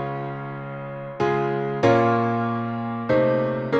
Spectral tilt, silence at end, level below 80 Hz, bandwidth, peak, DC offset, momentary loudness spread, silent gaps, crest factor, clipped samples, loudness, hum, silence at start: -8 dB/octave; 0 s; -56 dBFS; 7.6 kHz; -6 dBFS; under 0.1%; 14 LU; none; 18 dB; under 0.1%; -23 LUFS; none; 0 s